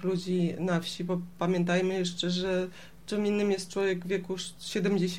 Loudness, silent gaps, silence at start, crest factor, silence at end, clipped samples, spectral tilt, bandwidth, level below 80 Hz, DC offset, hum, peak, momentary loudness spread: -30 LUFS; none; 0 s; 14 dB; 0 s; under 0.1%; -5.5 dB/octave; 14 kHz; -62 dBFS; 0.3%; none; -16 dBFS; 7 LU